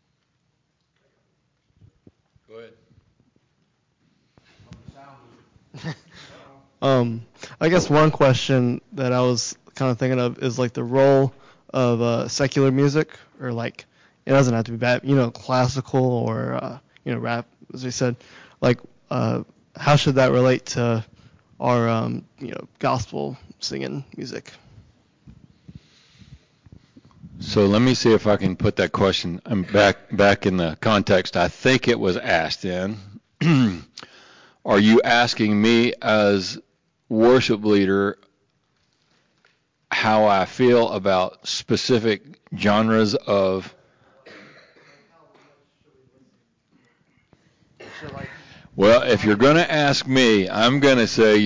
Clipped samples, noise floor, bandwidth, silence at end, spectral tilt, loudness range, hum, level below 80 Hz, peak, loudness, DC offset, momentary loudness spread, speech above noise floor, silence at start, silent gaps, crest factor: under 0.1%; -70 dBFS; 7.6 kHz; 0 s; -5.5 dB/octave; 8 LU; none; -50 dBFS; -8 dBFS; -20 LUFS; under 0.1%; 18 LU; 51 dB; 2.55 s; none; 14 dB